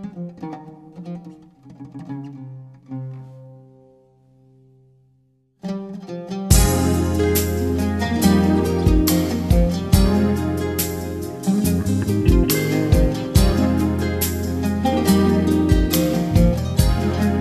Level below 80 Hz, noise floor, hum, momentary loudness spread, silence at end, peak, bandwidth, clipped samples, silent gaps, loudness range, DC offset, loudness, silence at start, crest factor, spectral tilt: -26 dBFS; -61 dBFS; none; 18 LU; 0 s; -2 dBFS; 14.5 kHz; under 0.1%; none; 19 LU; under 0.1%; -19 LUFS; 0 s; 18 dB; -6 dB/octave